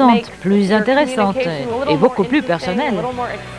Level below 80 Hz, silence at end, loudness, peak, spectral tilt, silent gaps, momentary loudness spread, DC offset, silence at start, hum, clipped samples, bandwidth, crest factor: -46 dBFS; 0 s; -17 LUFS; 0 dBFS; -6.5 dB/octave; none; 7 LU; 0.2%; 0 s; none; under 0.1%; 11 kHz; 16 dB